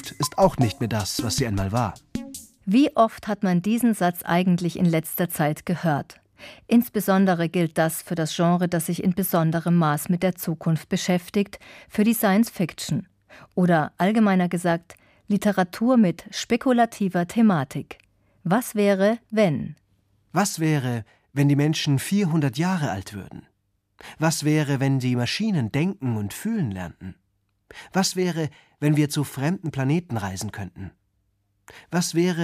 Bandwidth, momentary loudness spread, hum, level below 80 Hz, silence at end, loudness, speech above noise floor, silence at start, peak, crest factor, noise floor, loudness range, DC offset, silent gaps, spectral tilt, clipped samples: 15.5 kHz; 12 LU; none; -54 dBFS; 0 s; -23 LUFS; 48 dB; 0 s; -4 dBFS; 18 dB; -71 dBFS; 4 LU; under 0.1%; none; -6 dB/octave; under 0.1%